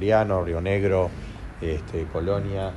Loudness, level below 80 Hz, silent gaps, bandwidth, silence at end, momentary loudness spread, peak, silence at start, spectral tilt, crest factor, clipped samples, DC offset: -25 LUFS; -38 dBFS; none; 11 kHz; 0 s; 11 LU; -6 dBFS; 0 s; -8 dB/octave; 18 dB; under 0.1%; under 0.1%